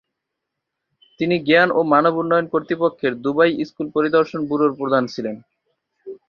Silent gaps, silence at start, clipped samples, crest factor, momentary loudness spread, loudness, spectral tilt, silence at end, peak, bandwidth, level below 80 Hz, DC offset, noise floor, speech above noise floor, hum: none; 1.2 s; under 0.1%; 18 dB; 11 LU; -19 LUFS; -7 dB/octave; 0.15 s; -2 dBFS; 6.8 kHz; -64 dBFS; under 0.1%; -80 dBFS; 62 dB; none